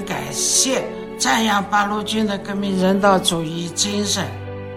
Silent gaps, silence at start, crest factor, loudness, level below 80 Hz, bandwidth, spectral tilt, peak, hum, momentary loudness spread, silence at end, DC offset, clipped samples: none; 0 s; 18 dB; -19 LUFS; -50 dBFS; 16.5 kHz; -3 dB/octave; -2 dBFS; none; 9 LU; 0 s; under 0.1%; under 0.1%